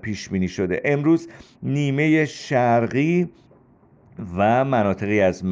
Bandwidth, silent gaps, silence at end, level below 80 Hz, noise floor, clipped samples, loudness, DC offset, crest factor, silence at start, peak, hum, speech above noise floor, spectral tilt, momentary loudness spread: 7.8 kHz; none; 0 s; -56 dBFS; -54 dBFS; under 0.1%; -21 LUFS; under 0.1%; 14 dB; 0.05 s; -8 dBFS; none; 33 dB; -7 dB/octave; 8 LU